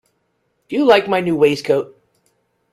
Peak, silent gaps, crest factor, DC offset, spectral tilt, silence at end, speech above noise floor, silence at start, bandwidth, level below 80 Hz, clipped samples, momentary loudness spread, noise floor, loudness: -2 dBFS; none; 18 dB; under 0.1%; -5.5 dB/octave; 0.85 s; 52 dB; 0.7 s; 13.5 kHz; -58 dBFS; under 0.1%; 10 LU; -67 dBFS; -16 LUFS